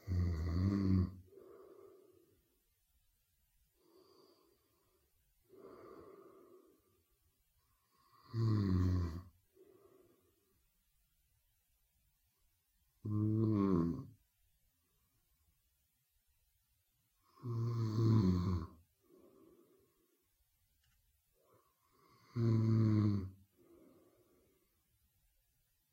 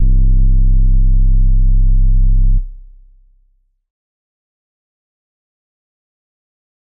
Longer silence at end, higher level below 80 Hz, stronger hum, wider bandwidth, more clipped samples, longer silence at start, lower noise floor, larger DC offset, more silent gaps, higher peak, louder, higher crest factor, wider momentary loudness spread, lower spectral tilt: second, 2.6 s vs 4.05 s; second, -60 dBFS vs -12 dBFS; neither; first, 7 kHz vs 0.5 kHz; neither; about the same, 0.05 s vs 0 s; first, -80 dBFS vs -57 dBFS; neither; neither; second, -18 dBFS vs -6 dBFS; second, -36 LUFS vs -16 LUFS; first, 22 dB vs 6 dB; first, 21 LU vs 3 LU; second, -9.5 dB/octave vs -23.5 dB/octave